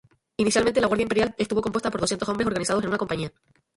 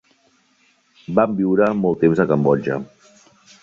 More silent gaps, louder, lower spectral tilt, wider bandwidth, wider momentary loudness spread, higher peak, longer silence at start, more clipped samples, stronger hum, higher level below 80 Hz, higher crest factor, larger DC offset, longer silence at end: neither; second, -24 LUFS vs -18 LUFS; second, -4.5 dB/octave vs -9 dB/octave; first, 11.5 kHz vs 7.4 kHz; about the same, 7 LU vs 9 LU; second, -8 dBFS vs -2 dBFS; second, 0.4 s vs 1.1 s; neither; neither; about the same, -52 dBFS vs -56 dBFS; about the same, 18 dB vs 18 dB; neither; second, 0.45 s vs 0.8 s